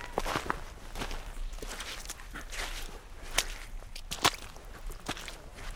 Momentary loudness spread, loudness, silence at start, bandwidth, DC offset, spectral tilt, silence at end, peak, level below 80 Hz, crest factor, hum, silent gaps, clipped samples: 17 LU; -36 LUFS; 0 s; 18 kHz; under 0.1%; -2 dB/octave; 0 s; -8 dBFS; -42 dBFS; 28 dB; none; none; under 0.1%